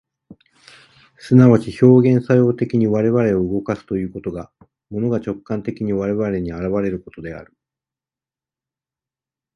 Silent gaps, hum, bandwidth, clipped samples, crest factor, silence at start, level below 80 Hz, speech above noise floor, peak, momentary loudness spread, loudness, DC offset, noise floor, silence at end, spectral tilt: none; none; 10.5 kHz; under 0.1%; 18 dB; 0.3 s; -48 dBFS; over 73 dB; 0 dBFS; 18 LU; -17 LUFS; under 0.1%; under -90 dBFS; 2.1 s; -9.5 dB/octave